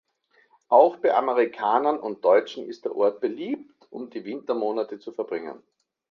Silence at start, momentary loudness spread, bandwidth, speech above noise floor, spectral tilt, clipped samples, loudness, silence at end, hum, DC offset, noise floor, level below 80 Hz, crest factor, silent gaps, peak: 0.7 s; 16 LU; 6.8 kHz; 41 dB; -6 dB/octave; under 0.1%; -24 LUFS; 0.55 s; none; under 0.1%; -64 dBFS; -78 dBFS; 22 dB; none; -4 dBFS